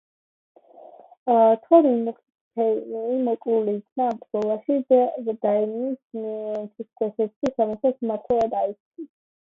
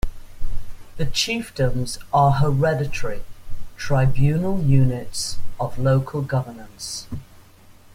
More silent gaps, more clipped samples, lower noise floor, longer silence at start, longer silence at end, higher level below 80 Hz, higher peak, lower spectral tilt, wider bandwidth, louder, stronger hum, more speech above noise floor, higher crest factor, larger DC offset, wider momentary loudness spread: first, 1.17-1.26 s, 2.35-2.51 s, 3.92-3.96 s, 6.04-6.10 s, 7.36-7.41 s, 8.80-8.91 s vs none; neither; about the same, -47 dBFS vs -47 dBFS; first, 0.8 s vs 0.05 s; second, 0.4 s vs 0.7 s; second, -66 dBFS vs -32 dBFS; about the same, -4 dBFS vs -4 dBFS; first, -8.5 dB/octave vs -5.5 dB/octave; second, 7.2 kHz vs 15.5 kHz; about the same, -23 LUFS vs -22 LUFS; neither; about the same, 25 dB vs 28 dB; about the same, 20 dB vs 16 dB; neither; second, 14 LU vs 19 LU